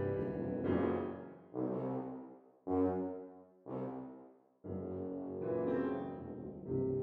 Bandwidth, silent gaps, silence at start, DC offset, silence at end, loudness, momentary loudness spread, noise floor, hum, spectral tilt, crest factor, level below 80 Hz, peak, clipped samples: 4.2 kHz; none; 0 s; under 0.1%; 0 s; -40 LUFS; 16 LU; -59 dBFS; none; -11 dB/octave; 18 dB; -66 dBFS; -22 dBFS; under 0.1%